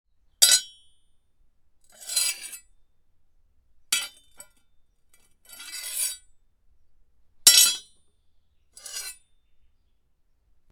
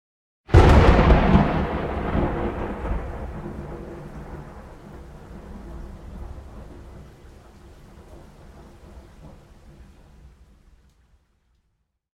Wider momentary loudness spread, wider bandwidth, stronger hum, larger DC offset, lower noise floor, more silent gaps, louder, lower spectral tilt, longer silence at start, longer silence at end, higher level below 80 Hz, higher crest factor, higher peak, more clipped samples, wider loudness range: second, 25 LU vs 28 LU; first, over 20 kHz vs 9.8 kHz; neither; neither; second, -65 dBFS vs -72 dBFS; neither; about the same, -20 LUFS vs -20 LUFS; second, 4 dB/octave vs -8 dB/octave; about the same, 0.4 s vs 0.5 s; second, 1.6 s vs 2.85 s; second, -66 dBFS vs -28 dBFS; first, 30 dB vs 22 dB; about the same, 0 dBFS vs -2 dBFS; neither; second, 13 LU vs 28 LU